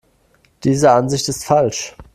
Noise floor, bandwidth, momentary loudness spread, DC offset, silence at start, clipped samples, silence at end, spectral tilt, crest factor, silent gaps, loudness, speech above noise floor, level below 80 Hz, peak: -57 dBFS; 14.5 kHz; 9 LU; under 0.1%; 0.65 s; under 0.1%; 0.1 s; -5 dB/octave; 18 dB; none; -16 LUFS; 41 dB; -48 dBFS; 0 dBFS